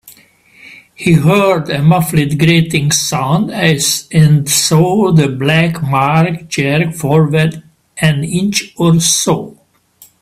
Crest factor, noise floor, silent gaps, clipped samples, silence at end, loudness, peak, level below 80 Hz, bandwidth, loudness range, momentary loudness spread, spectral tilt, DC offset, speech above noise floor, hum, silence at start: 12 dB; -46 dBFS; none; under 0.1%; 0.7 s; -12 LUFS; 0 dBFS; -44 dBFS; 15 kHz; 2 LU; 6 LU; -4.5 dB/octave; under 0.1%; 34 dB; none; 0.05 s